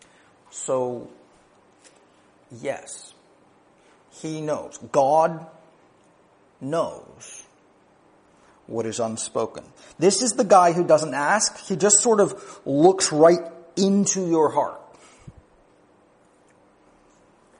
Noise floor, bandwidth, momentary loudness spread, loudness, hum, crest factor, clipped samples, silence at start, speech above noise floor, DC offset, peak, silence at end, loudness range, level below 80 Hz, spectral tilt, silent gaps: -58 dBFS; 10.5 kHz; 22 LU; -21 LUFS; none; 22 dB; under 0.1%; 0.55 s; 37 dB; under 0.1%; -2 dBFS; 2.3 s; 16 LU; -68 dBFS; -4 dB/octave; none